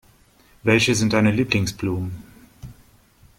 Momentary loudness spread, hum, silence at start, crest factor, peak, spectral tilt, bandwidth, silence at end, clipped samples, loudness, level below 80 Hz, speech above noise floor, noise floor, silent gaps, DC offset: 12 LU; none; 0.65 s; 20 dB; -4 dBFS; -5 dB/octave; 16.5 kHz; 0.65 s; under 0.1%; -20 LUFS; -48 dBFS; 35 dB; -55 dBFS; none; under 0.1%